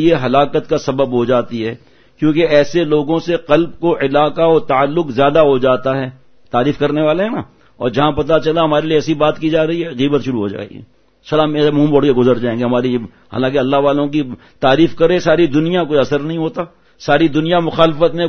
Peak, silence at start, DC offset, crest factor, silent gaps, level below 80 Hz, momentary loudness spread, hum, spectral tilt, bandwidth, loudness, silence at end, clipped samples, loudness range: 0 dBFS; 0 s; under 0.1%; 14 dB; none; -42 dBFS; 9 LU; none; -7 dB/octave; 6.6 kHz; -14 LUFS; 0 s; under 0.1%; 2 LU